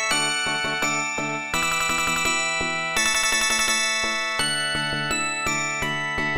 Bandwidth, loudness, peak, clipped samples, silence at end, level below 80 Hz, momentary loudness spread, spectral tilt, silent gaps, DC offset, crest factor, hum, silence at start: 17 kHz; -22 LUFS; -8 dBFS; under 0.1%; 0 s; -46 dBFS; 5 LU; -1 dB/octave; none; under 0.1%; 16 dB; none; 0 s